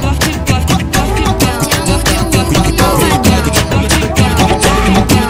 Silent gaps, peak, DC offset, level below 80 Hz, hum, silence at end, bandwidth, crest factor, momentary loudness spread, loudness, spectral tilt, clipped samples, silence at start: none; 0 dBFS; under 0.1%; -18 dBFS; none; 0 s; 16.5 kHz; 10 dB; 3 LU; -11 LUFS; -4.5 dB/octave; under 0.1%; 0 s